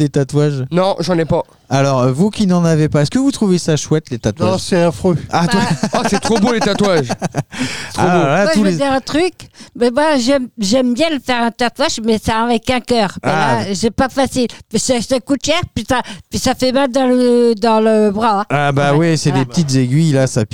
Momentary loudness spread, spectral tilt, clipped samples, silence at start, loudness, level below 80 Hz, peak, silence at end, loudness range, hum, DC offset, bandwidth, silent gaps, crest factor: 5 LU; -5.5 dB/octave; under 0.1%; 0 s; -15 LUFS; -42 dBFS; -2 dBFS; 0 s; 3 LU; none; 1%; 16.5 kHz; none; 12 dB